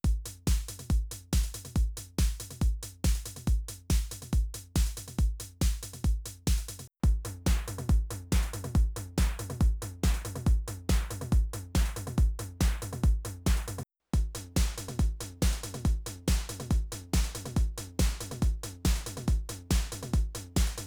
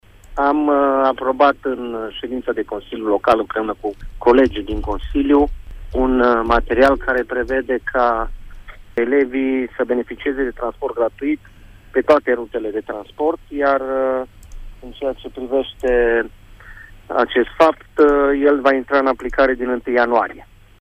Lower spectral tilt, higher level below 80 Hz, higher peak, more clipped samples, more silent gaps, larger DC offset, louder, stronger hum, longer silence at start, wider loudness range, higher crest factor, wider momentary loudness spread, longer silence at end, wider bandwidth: second, -5 dB/octave vs -6.5 dB/octave; about the same, -30 dBFS vs -34 dBFS; second, -12 dBFS vs -2 dBFS; neither; neither; neither; second, -32 LUFS vs -18 LUFS; neither; second, 0.05 s vs 0.3 s; second, 2 LU vs 5 LU; about the same, 16 dB vs 16 dB; second, 3 LU vs 11 LU; second, 0 s vs 0.35 s; first, over 20 kHz vs 10.5 kHz